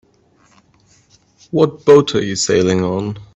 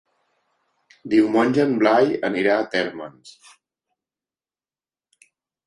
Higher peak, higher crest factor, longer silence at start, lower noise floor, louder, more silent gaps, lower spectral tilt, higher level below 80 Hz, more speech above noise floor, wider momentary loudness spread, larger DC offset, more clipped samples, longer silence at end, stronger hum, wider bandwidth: about the same, 0 dBFS vs -2 dBFS; about the same, 16 dB vs 20 dB; first, 1.55 s vs 1.05 s; second, -54 dBFS vs under -90 dBFS; first, -14 LUFS vs -19 LUFS; neither; about the same, -5 dB/octave vs -6 dB/octave; first, -52 dBFS vs -66 dBFS; second, 40 dB vs over 70 dB; second, 10 LU vs 17 LU; neither; neither; second, 0.1 s vs 2.35 s; neither; second, 8.4 kHz vs 11 kHz